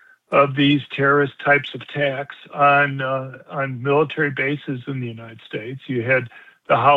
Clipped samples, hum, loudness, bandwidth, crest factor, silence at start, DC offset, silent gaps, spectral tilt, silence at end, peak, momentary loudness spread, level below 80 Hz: under 0.1%; none; -20 LUFS; 4.9 kHz; 18 dB; 0.3 s; under 0.1%; none; -8 dB/octave; 0 s; -2 dBFS; 15 LU; -68 dBFS